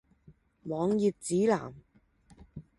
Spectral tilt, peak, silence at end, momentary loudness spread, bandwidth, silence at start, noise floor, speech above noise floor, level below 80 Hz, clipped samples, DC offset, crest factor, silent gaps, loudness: -6 dB/octave; -14 dBFS; 0.15 s; 21 LU; 11.5 kHz; 0.3 s; -62 dBFS; 33 dB; -64 dBFS; under 0.1%; under 0.1%; 18 dB; none; -30 LUFS